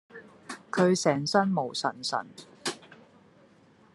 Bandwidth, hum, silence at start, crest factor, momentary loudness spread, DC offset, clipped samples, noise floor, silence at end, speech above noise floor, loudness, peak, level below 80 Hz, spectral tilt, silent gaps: 12 kHz; none; 0.15 s; 22 dB; 22 LU; under 0.1%; under 0.1%; -59 dBFS; 1.15 s; 32 dB; -28 LUFS; -8 dBFS; -76 dBFS; -4.5 dB/octave; none